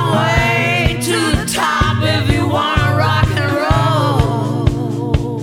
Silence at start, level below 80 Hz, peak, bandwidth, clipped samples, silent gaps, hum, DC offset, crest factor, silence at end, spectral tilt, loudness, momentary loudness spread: 0 s; -26 dBFS; 0 dBFS; 16.5 kHz; under 0.1%; none; none; under 0.1%; 14 dB; 0 s; -5.5 dB/octave; -15 LUFS; 4 LU